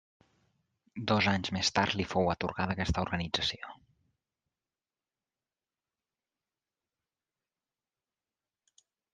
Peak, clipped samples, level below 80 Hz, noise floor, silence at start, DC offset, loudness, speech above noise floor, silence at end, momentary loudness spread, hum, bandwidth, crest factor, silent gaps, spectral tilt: -12 dBFS; under 0.1%; -54 dBFS; under -90 dBFS; 0.95 s; under 0.1%; -31 LUFS; over 59 dB; 5.4 s; 12 LU; none; 9.4 kHz; 26 dB; none; -4.5 dB/octave